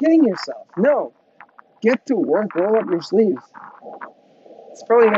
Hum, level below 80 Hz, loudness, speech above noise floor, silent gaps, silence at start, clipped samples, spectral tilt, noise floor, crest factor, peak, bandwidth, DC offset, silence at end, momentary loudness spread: none; -76 dBFS; -19 LUFS; 30 dB; none; 0 s; under 0.1%; -7 dB/octave; -48 dBFS; 16 dB; -4 dBFS; 7.8 kHz; under 0.1%; 0 s; 22 LU